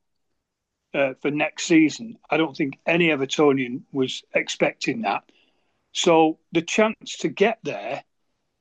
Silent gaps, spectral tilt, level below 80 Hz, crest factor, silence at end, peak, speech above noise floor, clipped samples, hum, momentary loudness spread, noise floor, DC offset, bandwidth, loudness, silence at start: none; -4.5 dB/octave; -72 dBFS; 18 dB; 0.6 s; -6 dBFS; 58 dB; under 0.1%; none; 11 LU; -80 dBFS; under 0.1%; 9.2 kHz; -22 LUFS; 0.95 s